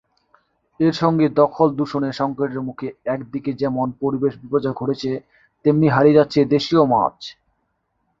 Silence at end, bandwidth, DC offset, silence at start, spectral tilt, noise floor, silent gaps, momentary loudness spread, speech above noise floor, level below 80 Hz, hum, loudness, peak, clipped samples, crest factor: 0.9 s; 7.6 kHz; under 0.1%; 0.8 s; -7.5 dB/octave; -70 dBFS; none; 12 LU; 52 dB; -56 dBFS; none; -19 LUFS; -2 dBFS; under 0.1%; 18 dB